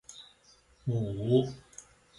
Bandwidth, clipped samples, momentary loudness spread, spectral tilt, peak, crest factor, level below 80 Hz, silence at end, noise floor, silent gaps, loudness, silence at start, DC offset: 11.5 kHz; under 0.1%; 23 LU; -7.5 dB/octave; -12 dBFS; 20 dB; -60 dBFS; 0.4 s; -63 dBFS; none; -31 LUFS; 0.1 s; under 0.1%